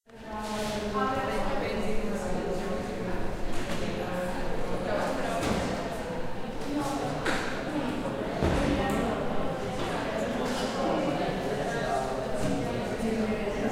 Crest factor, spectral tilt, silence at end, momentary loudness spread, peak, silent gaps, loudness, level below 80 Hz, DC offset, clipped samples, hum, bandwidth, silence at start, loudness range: 16 dB; -5.5 dB/octave; 0 s; 6 LU; -12 dBFS; none; -31 LUFS; -40 dBFS; under 0.1%; under 0.1%; none; 15.5 kHz; 0.1 s; 3 LU